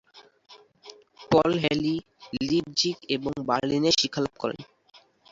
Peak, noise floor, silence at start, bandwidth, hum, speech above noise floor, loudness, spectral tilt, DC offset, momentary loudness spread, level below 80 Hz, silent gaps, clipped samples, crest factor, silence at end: -8 dBFS; -51 dBFS; 0.15 s; 7.8 kHz; none; 25 dB; -25 LUFS; -4.5 dB/octave; under 0.1%; 11 LU; -58 dBFS; none; under 0.1%; 20 dB; 0.7 s